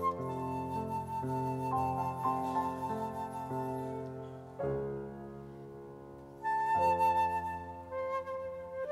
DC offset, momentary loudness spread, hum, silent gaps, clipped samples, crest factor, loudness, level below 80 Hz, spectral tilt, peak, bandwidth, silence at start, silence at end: under 0.1%; 17 LU; none; none; under 0.1%; 16 dB; -35 LUFS; -62 dBFS; -7.5 dB/octave; -20 dBFS; 16 kHz; 0 s; 0 s